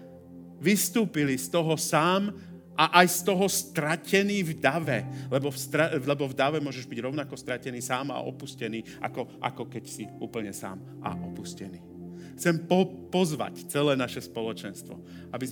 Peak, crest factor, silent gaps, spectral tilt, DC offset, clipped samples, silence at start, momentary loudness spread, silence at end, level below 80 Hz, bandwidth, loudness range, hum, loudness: -2 dBFS; 28 dB; none; -4.5 dB/octave; under 0.1%; under 0.1%; 0 s; 16 LU; 0 s; -70 dBFS; over 20 kHz; 11 LU; none; -28 LUFS